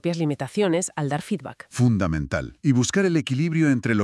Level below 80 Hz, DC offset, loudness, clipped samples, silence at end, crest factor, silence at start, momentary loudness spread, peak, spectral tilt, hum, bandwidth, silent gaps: -48 dBFS; under 0.1%; -23 LUFS; under 0.1%; 0 s; 16 dB; 0.05 s; 8 LU; -8 dBFS; -6 dB/octave; none; 12 kHz; none